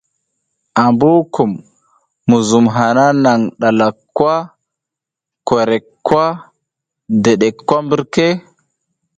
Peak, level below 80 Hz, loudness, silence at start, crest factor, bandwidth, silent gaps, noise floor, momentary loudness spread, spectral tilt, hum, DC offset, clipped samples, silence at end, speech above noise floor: 0 dBFS; -54 dBFS; -14 LUFS; 0.75 s; 14 dB; 9.2 kHz; none; -84 dBFS; 9 LU; -6 dB/octave; none; under 0.1%; under 0.1%; 0.8 s; 71 dB